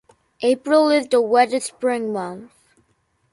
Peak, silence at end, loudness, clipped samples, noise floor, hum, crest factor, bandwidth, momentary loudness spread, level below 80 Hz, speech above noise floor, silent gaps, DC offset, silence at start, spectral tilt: -4 dBFS; 0.85 s; -19 LUFS; under 0.1%; -66 dBFS; none; 16 dB; 11.5 kHz; 12 LU; -68 dBFS; 47 dB; none; under 0.1%; 0.4 s; -4 dB/octave